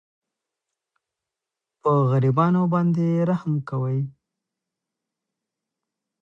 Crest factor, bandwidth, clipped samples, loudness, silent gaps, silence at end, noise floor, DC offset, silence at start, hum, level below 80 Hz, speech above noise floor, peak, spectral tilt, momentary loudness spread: 18 dB; 6.4 kHz; under 0.1%; -22 LUFS; none; 2.1 s; -87 dBFS; under 0.1%; 1.85 s; none; -64 dBFS; 66 dB; -6 dBFS; -10.5 dB/octave; 8 LU